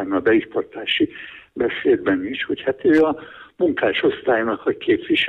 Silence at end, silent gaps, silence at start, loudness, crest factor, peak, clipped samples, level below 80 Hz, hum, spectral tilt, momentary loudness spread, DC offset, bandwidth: 0 s; none; 0 s; -20 LUFS; 14 dB; -6 dBFS; under 0.1%; -56 dBFS; none; -6.5 dB/octave; 8 LU; under 0.1%; 5.2 kHz